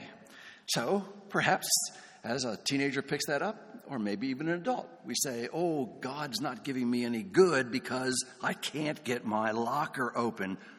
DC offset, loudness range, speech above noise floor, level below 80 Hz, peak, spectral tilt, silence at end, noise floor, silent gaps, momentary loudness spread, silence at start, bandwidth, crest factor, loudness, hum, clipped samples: under 0.1%; 3 LU; 21 dB; -76 dBFS; -10 dBFS; -3.5 dB/octave; 0 s; -53 dBFS; none; 10 LU; 0 s; 18 kHz; 22 dB; -32 LUFS; none; under 0.1%